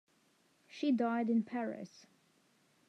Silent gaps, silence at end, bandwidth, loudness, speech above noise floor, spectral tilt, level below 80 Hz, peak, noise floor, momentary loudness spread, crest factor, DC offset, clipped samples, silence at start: none; 0.9 s; 7.8 kHz; -35 LUFS; 38 dB; -6.5 dB/octave; under -90 dBFS; -22 dBFS; -72 dBFS; 18 LU; 16 dB; under 0.1%; under 0.1%; 0.7 s